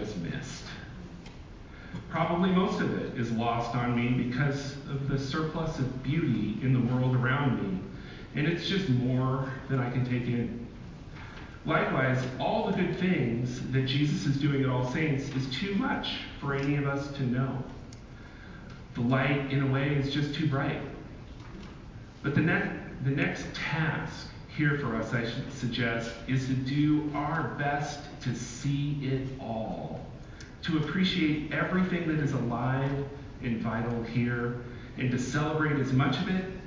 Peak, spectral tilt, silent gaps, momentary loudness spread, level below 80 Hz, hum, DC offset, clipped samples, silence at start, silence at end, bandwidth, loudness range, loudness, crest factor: -12 dBFS; -6.5 dB/octave; none; 17 LU; -50 dBFS; none; under 0.1%; under 0.1%; 0 s; 0 s; 7.6 kHz; 3 LU; -30 LUFS; 18 dB